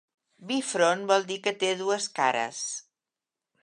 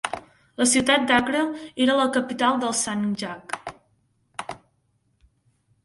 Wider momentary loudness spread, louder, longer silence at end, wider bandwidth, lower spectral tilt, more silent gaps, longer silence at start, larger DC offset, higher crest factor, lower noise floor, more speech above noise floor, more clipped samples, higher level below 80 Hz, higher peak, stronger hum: second, 8 LU vs 20 LU; second, -27 LUFS vs -22 LUFS; second, 0.8 s vs 1.3 s; about the same, 11.5 kHz vs 12 kHz; about the same, -2.5 dB/octave vs -2.5 dB/octave; neither; first, 0.4 s vs 0.05 s; neither; about the same, 20 dB vs 20 dB; first, -90 dBFS vs -68 dBFS; first, 63 dB vs 46 dB; neither; second, -84 dBFS vs -60 dBFS; about the same, -8 dBFS vs -6 dBFS; neither